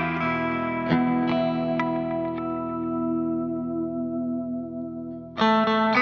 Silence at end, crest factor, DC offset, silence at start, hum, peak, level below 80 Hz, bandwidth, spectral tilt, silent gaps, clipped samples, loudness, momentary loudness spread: 0 s; 18 dB; under 0.1%; 0 s; none; -6 dBFS; -56 dBFS; 6.8 kHz; -4.5 dB/octave; none; under 0.1%; -26 LUFS; 11 LU